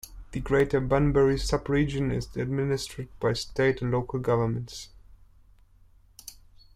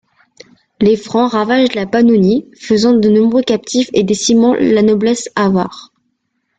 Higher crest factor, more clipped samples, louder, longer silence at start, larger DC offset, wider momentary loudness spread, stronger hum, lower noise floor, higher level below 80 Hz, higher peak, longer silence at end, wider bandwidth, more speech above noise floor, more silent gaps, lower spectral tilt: about the same, 16 dB vs 12 dB; neither; second, -27 LUFS vs -12 LUFS; second, 0.05 s vs 0.8 s; neither; first, 18 LU vs 5 LU; neither; second, -57 dBFS vs -67 dBFS; first, -42 dBFS vs -50 dBFS; second, -10 dBFS vs -2 dBFS; second, 0.4 s vs 0.8 s; first, 15.5 kHz vs 9.2 kHz; second, 31 dB vs 56 dB; neither; first, -6.5 dB/octave vs -5 dB/octave